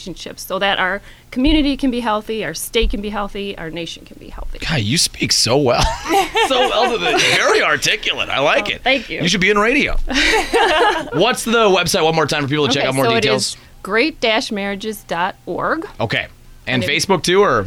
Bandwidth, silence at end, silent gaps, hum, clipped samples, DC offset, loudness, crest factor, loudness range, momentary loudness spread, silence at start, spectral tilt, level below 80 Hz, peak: 18.5 kHz; 0 s; none; none; under 0.1%; under 0.1%; -16 LUFS; 14 dB; 6 LU; 12 LU; 0 s; -3.5 dB/octave; -30 dBFS; -2 dBFS